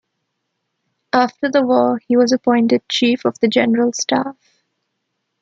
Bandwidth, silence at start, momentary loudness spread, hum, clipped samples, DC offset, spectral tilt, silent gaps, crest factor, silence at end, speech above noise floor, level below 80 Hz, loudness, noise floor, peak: 7.6 kHz; 1.15 s; 4 LU; none; under 0.1%; under 0.1%; -4 dB/octave; none; 16 dB; 1.1 s; 58 dB; -66 dBFS; -16 LUFS; -74 dBFS; -2 dBFS